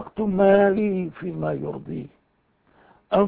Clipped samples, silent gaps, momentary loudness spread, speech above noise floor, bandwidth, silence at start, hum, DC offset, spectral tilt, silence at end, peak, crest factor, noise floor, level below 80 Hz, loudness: under 0.1%; none; 18 LU; 44 dB; 4.4 kHz; 0 s; none; under 0.1%; -11.5 dB/octave; 0 s; -6 dBFS; 18 dB; -66 dBFS; -54 dBFS; -22 LUFS